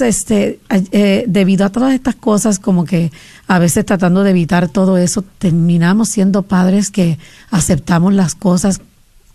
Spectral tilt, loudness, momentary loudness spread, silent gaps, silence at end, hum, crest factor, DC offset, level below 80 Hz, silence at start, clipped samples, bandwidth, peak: -6 dB/octave; -13 LUFS; 5 LU; none; 0.55 s; none; 12 dB; under 0.1%; -38 dBFS; 0 s; under 0.1%; 13.5 kHz; -2 dBFS